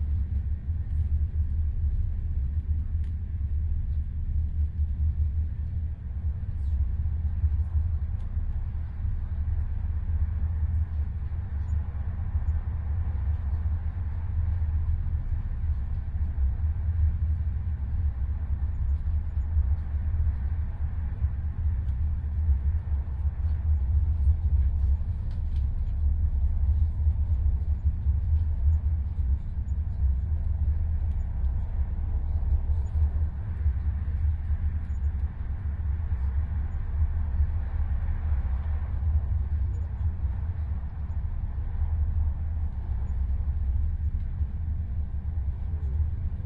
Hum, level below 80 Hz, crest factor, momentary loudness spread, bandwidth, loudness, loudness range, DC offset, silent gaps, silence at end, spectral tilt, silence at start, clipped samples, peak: none; -28 dBFS; 14 dB; 6 LU; 2.4 kHz; -30 LUFS; 3 LU; under 0.1%; none; 0 s; -10.5 dB/octave; 0 s; under 0.1%; -12 dBFS